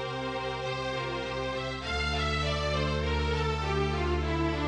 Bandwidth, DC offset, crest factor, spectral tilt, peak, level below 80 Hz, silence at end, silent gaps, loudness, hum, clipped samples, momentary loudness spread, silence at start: 9.8 kHz; under 0.1%; 14 dB; -5.5 dB/octave; -16 dBFS; -36 dBFS; 0 s; none; -30 LUFS; none; under 0.1%; 4 LU; 0 s